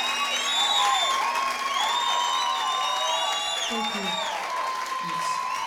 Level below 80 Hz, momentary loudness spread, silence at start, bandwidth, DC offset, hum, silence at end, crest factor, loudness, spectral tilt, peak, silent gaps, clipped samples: -66 dBFS; 7 LU; 0 s; 20 kHz; under 0.1%; none; 0 s; 14 dB; -24 LUFS; 0 dB/octave; -10 dBFS; none; under 0.1%